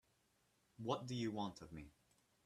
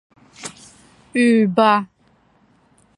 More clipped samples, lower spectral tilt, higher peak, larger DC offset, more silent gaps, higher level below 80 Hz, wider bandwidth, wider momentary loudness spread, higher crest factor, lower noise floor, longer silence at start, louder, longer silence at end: neither; about the same, -6 dB/octave vs -5.5 dB/octave; second, -26 dBFS vs -2 dBFS; neither; neither; second, -74 dBFS vs -66 dBFS; first, 13.5 kHz vs 11 kHz; second, 14 LU vs 20 LU; about the same, 22 dB vs 20 dB; first, -80 dBFS vs -58 dBFS; first, 0.8 s vs 0.4 s; second, -46 LUFS vs -16 LUFS; second, 0.55 s vs 1.15 s